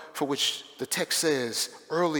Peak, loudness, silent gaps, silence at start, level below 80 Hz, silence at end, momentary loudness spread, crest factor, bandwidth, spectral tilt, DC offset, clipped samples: -14 dBFS; -28 LUFS; none; 0 s; -78 dBFS; 0 s; 6 LU; 16 dB; over 20 kHz; -2.5 dB/octave; under 0.1%; under 0.1%